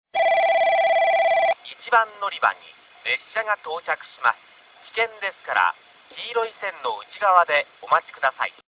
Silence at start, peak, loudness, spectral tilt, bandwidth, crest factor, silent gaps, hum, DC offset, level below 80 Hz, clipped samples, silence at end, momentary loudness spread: 0.15 s; -2 dBFS; -22 LUFS; -4 dB/octave; 4 kHz; 20 dB; none; none; under 0.1%; -72 dBFS; under 0.1%; 0.2 s; 12 LU